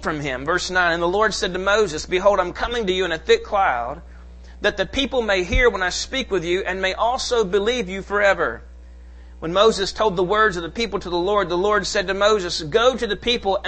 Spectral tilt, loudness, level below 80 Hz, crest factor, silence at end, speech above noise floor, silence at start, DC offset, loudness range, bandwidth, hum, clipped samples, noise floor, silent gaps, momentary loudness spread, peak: -3.5 dB/octave; -20 LUFS; -36 dBFS; 18 dB; 0 s; 20 dB; 0 s; under 0.1%; 2 LU; 8.8 kHz; none; under 0.1%; -40 dBFS; none; 6 LU; -2 dBFS